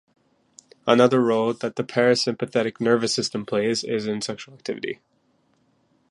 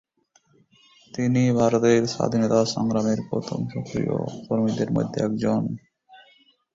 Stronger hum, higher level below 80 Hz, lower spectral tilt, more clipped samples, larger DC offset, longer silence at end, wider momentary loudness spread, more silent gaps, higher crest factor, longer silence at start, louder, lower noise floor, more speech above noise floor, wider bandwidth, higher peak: neither; second, -68 dBFS vs -56 dBFS; second, -4.5 dB/octave vs -6.5 dB/octave; neither; neither; first, 1.15 s vs 0.6 s; first, 13 LU vs 10 LU; neither; about the same, 22 dB vs 18 dB; second, 0.85 s vs 1.15 s; about the same, -23 LUFS vs -23 LUFS; about the same, -65 dBFS vs -64 dBFS; about the same, 43 dB vs 41 dB; first, 11.5 kHz vs 7.8 kHz; first, -2 dBFS vs -6 dBFS